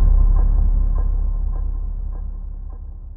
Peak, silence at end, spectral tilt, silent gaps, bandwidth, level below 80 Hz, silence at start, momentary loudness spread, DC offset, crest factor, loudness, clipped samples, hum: -6 dBFS; 0 s; -14.5 dB/octave; none; 1.7 kHz; -18 dBFS; 0 s; 16 LU; under 0.1%; 12 dB; -23 LUFS; under 0.1%; none